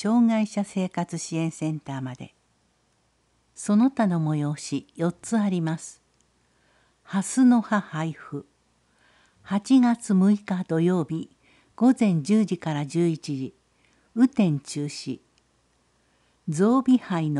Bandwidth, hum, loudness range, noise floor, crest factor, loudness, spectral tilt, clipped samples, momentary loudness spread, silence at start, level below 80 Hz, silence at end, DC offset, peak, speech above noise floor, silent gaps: 11.5 kHz; none; 5 LU; -67 dBFS; 16 dB; -24 LUFS; -6.5 dB/octave; under 0.1%; 15 LU; 0 s; -70 dBFS; 0 s; under 0.1%; -8 dBFS; 44 dB; none